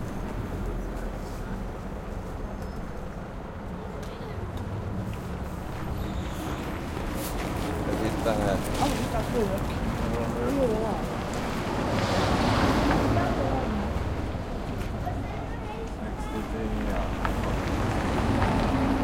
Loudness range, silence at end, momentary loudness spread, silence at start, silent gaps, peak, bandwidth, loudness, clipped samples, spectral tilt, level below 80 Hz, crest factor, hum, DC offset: 10 LU; 0 s; 11 LU; 0 s; none; -10 dBFS; 16.5 kHz; -29 LUFS; under 0.1%; -6 dB/octave; -36 dBFS; 18 dB; none; under 0.1%